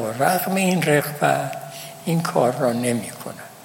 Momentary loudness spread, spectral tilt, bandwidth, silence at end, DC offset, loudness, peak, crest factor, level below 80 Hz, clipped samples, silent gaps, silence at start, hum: 14 LU; -5 dB/octave; 17 kHz; 0 s; under 0.1%; -21 LUFS; -4 dBFS; 18 dB; -66 dBFS; under 0.1%; none; 0 s; none